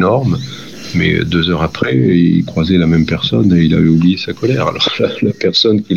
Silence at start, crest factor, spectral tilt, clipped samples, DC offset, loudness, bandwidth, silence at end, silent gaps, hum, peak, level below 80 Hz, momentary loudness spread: 0 s; 12 dB; -7 dB/octave; under 0.1%; 0.6%; -13 LUFS; 7.2 kHz; 0 s; none; none; 0 dBFS; -40 dBFS; 6 LU